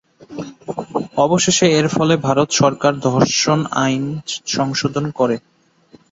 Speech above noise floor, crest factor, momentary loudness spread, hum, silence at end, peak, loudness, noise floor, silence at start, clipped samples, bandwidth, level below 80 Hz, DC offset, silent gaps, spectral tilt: 34 dB; 16 dB; 14 LU; none; 0.75 s; -2 dBFS; -17 LUFS; -50 dBFS; 0.3 s; under 0.1%; 8 kHz; -54 dBFS; under 0.1%; none; -4.5 dB/octave